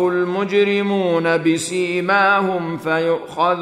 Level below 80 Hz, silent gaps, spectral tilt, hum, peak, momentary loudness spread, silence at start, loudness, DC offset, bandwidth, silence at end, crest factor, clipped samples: -66 dBFS; none; -5 dB/octave; none; -4 dBFS; 6 LU; 0 s; -18 LUFS; under 0.1%; 14 kHz; 0 s; 14 dB; under 0.1%